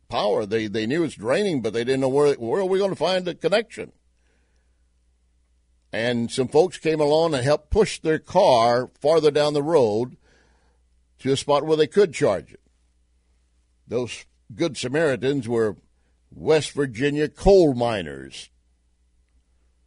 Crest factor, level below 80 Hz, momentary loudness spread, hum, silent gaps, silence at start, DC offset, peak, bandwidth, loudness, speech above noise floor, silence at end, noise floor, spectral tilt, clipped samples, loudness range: 18 dB; -44 dBFS; 11 LU; none; none; 0.1 s; under 0.1%; -4 dBFS; 11 kHz; -22 LUFS; 43 dB; 1.4 s; -64 dBFS; -5.5 dB/octave; under 0.1%; 7 LU